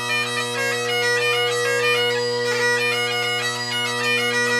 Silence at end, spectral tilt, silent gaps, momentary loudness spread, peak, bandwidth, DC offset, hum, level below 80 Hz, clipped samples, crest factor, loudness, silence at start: 0 s; -2 dB/octave; none; 4 LU; -8 dBFS; 15.5 kHz; under 0.1%; none; -72 dBFS; under 0.1%; 14 dB; -20 LUFS; 0 s